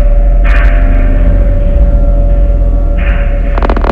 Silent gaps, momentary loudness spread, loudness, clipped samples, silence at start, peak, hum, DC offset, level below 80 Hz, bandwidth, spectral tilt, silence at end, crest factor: none; 3 LU; -11 LUFS; 0.5%; 0 s; 0 dBFS; none; under 0.1%; -6 dBFS; 3.6 kHz; -9 dB/octave; 0 s; 6 dB